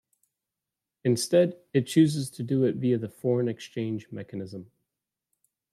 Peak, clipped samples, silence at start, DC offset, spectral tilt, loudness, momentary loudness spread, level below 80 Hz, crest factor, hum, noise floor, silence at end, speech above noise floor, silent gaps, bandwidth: -10 dBFS; under 0.1%; 1.05 s; under 0.1%; -6.5 dB/octave; -26 LUFS; 15 LU; -72 dBFS; 18 dB; none; -88 dBFS; 1.1 s; 62 dB; none; 14.5 kHz